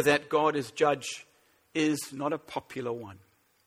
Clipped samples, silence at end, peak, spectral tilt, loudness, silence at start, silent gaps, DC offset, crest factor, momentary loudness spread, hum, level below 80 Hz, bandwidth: under 0.1%; 0.5 s; -10 dBFS; -4 dB/octave; -30 LUFS; 0 s; none; under 0.1%; 22 dB; 13 LU; none; -70 dBFS; 16 kHz